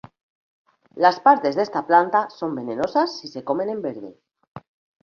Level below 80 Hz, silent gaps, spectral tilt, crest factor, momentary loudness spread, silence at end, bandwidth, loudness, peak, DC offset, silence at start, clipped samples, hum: -68 dBFS; 4.47-4.55 s; -5.5 dB/octave; 20 dB; 14 LU; 0.45 s; 7 kHz; -21 LUFS; -2 dBFS; under 0.1%; 0.95 s; under 0.1%; none